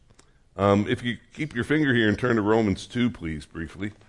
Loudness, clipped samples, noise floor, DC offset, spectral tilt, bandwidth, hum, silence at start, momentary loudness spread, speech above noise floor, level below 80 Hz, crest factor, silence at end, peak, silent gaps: -25 LUFS; under 0.1%; -57 dBFS; under 0.1%; -6.5 dB/octave; 11.5 kHz; none; 0.55 s; 13 LU; 33 dB; -52 dBFS; 18 dB; 0.15 s; -8 dBFS; none